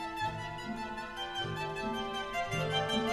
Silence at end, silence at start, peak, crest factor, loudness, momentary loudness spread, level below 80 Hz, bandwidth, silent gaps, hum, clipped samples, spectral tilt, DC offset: 0 s; 0 s; -20 dBFS; 16 dB; -36 LUFS; 8 LU; -56 dBFS; 14 kHz; none; none; under 0.1%; -4.5 dB/octave; under 0.1%